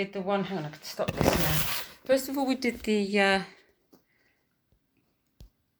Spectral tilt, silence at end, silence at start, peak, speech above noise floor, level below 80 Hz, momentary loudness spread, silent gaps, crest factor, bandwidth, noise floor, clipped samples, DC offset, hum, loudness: -4.5 dB/octave; 0.35 s; 0 s; -4 dBFS; 45 dB; -50 dBFS; 10 LU; none; 26 dB; over 20 kHz; -73 dBFS; under 0.1%; under 0.1%; none; -27 LUFS